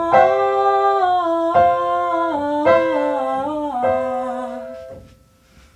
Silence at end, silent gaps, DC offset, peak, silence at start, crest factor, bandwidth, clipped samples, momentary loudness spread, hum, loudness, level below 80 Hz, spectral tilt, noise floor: 0.75 s; none; under 0.1%; 0 dBFS; 0 s; 18 dB; 10 kHz; under 0.1%; 12 LU; none; -18 LUFS; -52 dBFS; -6 dB/octave; -51 dBFS